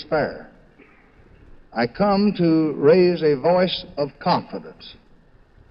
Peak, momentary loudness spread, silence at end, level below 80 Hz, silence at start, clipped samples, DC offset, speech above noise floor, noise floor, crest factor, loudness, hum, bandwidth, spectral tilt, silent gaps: -4 dBFS; 17 LU; 0.8 s; -52 dBFS; 0 s; under 0.1%; under 0.1%; 32 dB; -52 dBFS; 18 dB; -20 LUFS; none; 5.8 kHz; -9.5 dB/octave; none